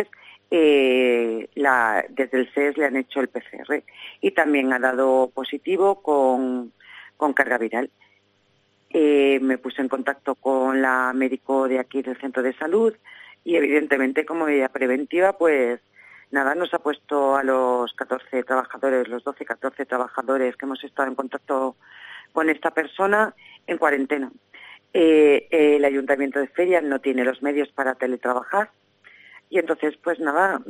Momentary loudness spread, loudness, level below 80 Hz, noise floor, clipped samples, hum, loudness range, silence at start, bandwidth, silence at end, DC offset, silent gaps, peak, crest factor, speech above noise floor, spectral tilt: 10 LU; -22 LUFS; -74 dBFS; -64 dBFS; under 0.1%; none; 5 LU; 0 s; 15.5 kHz; 0 s; under 0.1%; none; -2 dBFS; 20 dB; 42 dB; -4.5 dB/octave